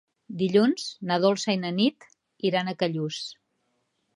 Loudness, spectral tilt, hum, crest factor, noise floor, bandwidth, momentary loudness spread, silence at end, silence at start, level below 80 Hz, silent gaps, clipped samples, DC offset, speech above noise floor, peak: -26 LUFS; -5.5 dB/octave; none; 18 dB; -74 dBFS; 11.5 kHz; 10 LU; 0.8 s; 0.3 s; -76 dBFS; none; under 0.1%; under 0.1%; 49 dB; -8 dBFS